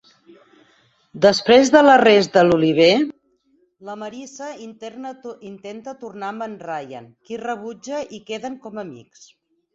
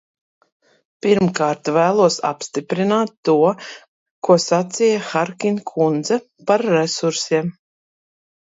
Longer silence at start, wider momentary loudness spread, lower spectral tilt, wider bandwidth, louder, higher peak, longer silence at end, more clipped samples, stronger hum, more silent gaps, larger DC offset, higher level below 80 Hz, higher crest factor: about the same, 1.15 s vs 1.05 s; first, 23 LU vs 8 LU; about the same, -4.5 dB/octave vs -5 dB/octave; about the same, 8 kHz vs 8 kHz; about the same, -16 LUFS vs -18 LUFS; about the same, -2 dBFS vs 0 dBFS; second, 0.8 s vs 0.95 s; neither; neither; second, none vs 3.17-3.23 s, 3.88-4.22 s; neither; about the same, -60 dBFS vs -64 dBFS; about the same, 18 dB vs 18 dB